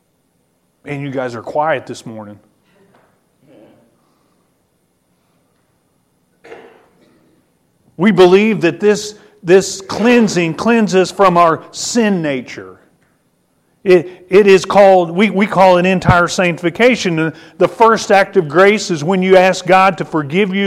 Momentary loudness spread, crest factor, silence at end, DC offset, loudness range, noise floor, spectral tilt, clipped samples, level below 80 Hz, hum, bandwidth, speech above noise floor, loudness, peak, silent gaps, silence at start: 13 LU; 14 dB; 0 s; under 0.1%; 13 LU; -61 dBFS; -5.5 dB/octave; under 0.1%; -44 dBFS; none; 13.5 kHz; 49 dB; -12 LUFS; 0 dBFS; none; 0.85 s